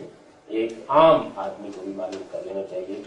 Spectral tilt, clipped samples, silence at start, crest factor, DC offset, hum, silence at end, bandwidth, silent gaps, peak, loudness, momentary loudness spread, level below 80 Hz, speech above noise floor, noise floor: -6 dB/octave; under 0.1%; 0 s; 20 dB; under 0.1%; none; 0 s; 9.2 kHz; none; -4 dBFS; -23 LUFS; 17 LU; -60 dBFS; 21 dB; -44 dBFS